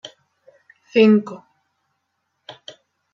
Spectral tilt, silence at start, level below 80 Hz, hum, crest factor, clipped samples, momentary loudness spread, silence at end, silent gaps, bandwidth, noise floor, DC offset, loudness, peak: -7 dB/octave; 0.95 s; -72 dBFS; none; 20 dB; under 0.1%; 27 LU; 1.75 s; none; 7 kHz; -74 dBFS; under 0.1%; -16 LUFS; -2 dBFS